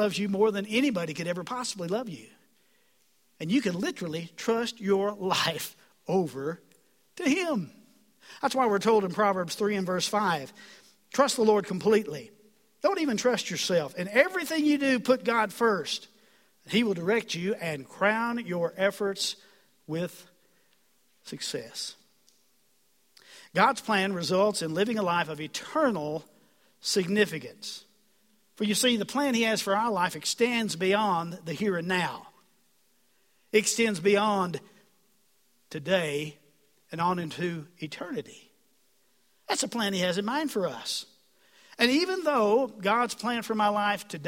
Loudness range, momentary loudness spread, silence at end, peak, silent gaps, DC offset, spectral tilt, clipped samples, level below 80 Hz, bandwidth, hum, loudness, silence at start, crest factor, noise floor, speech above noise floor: 6 LU; 12 LU; 0 s; -6 dBFS; none; under 0.1%; -4 dB/octave; under 0.1%; -72 dBFS; 16.5 kHz; none; -28 LUFS; 0 s; 24 dB; -69 dBFS; 42 dB